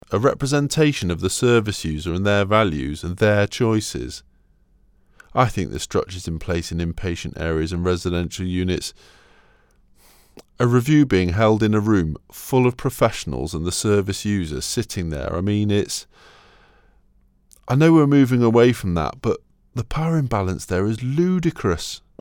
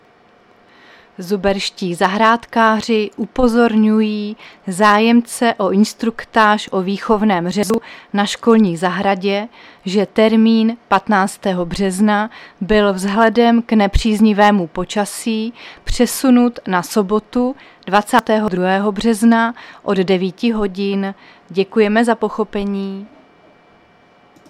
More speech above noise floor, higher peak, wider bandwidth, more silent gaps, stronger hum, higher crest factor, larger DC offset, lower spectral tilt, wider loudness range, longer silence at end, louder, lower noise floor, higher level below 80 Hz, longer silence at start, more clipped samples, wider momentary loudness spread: about the same, 38 dB vs 35 dB; second, -4 dBFS vs 0 dBFS; first, 18 kHz vs 14.5 kHz; neither; neither; about the same, 18 dB vs 16 dB; neither; about the same, -6 dB/octave vs -5.5 dB/octave; first, 7 LU vs 3 LU; second, 0.2 s vs 1.4 s; second, -20 LUFS vs -15 LUFS; first, -57 dBFS vs -50 dBFS; second, -42 dBFS vs -36 dBFS; second, 0.1 s vs 1.2 s; neither; about the same, 11 LU vs 10 LU